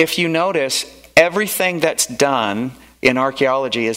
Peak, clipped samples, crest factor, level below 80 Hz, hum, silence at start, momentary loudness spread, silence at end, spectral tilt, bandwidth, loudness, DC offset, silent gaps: 0 dBFS; under 0.1%; 18 dB; -54 dBFS; none; 0 s; 7 LU; 0 s; -3 dB/octave; 16.5 kHz; -17 LUFS; under 0.1%; none